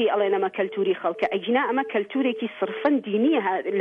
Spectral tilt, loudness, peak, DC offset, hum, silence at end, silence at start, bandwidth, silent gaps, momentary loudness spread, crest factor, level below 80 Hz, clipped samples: -7.5 dB/octave; -24 LUFS; -8 dBFS; under 0.1%; none; 0 s; 0 s; 5.4 kHz; none; 4 LU; 14 dB; -74 dBFS; under 0.1%